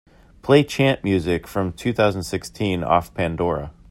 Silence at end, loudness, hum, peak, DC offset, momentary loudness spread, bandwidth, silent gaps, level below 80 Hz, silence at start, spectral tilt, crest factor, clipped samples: 0.2 s; -21 LUFS; none; -2 dBFS; under 0.1%; 10 LU; 16 kHz; none; -46 dBFS; 0.45 s; -6 dB/octave; 20 dB; under 0.1%